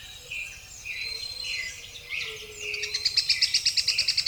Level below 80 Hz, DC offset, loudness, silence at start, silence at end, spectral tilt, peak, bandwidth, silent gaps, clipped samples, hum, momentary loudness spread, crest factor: -56 dBFS; under 0.1%; -26 LUFS; 0 s; 0 s; 1.5 dB/octave; -8 dBFS; over 20 kHz; none; under 0.1%; none; 14 LU; 22 dB